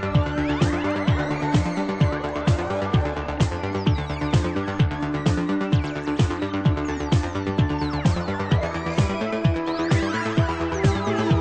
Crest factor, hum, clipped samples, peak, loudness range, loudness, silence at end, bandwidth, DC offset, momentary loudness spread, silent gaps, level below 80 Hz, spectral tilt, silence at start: 16 dB; none; under 0.1%; -6 dBFS; 1 LU; -23 LUFS; 0 s; 9.4 kHz; under 0.1%; 2 LU; none; -34 dBFS; -7 dB/octave; 0 s